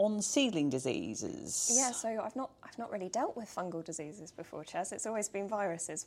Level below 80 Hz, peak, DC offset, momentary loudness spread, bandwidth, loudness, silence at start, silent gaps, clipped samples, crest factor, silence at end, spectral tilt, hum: -74 dBFS; -16 dBFS; under 0.1%; 15 LU; 16 kHz; -35 LUFS; 0 s; none; under 0.1%; 20 dB; 0 s; -3 dB/octave; none